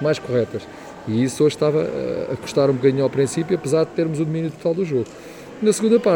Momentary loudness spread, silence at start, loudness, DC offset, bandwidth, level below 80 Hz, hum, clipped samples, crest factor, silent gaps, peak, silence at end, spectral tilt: 11 LU; 0 s; -21 LUFS; under 0.1%; 18.5 kHz; -58 dBFS; none; under 0.1%; 16 dB; none; -4 dBFS; 0 s; -6 dB/octave